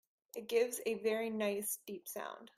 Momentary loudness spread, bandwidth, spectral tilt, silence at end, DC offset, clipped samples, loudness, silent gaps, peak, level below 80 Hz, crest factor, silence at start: 11 LU; 16 kHz; -3 dB/octave; 0.1 s; under 0.1%; under 0.1%; -38 LUFS; none; -20 dBFS; -84 dBFS; 18 dB; 0.35 s